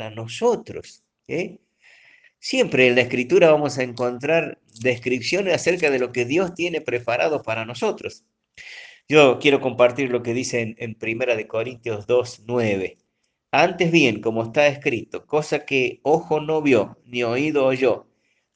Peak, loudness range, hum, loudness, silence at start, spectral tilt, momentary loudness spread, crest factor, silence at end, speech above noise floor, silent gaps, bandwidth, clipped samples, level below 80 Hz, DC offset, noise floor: 0 dBFS; 3 LU; none; -21 LUFS; 0 s; -5 dB/octave; 13 LU; 22 dB; 0.55 s; 53 dB; none; 9.8 kHz; under 0.1%; -64 dBFS; under 0.1%; -74 dBFS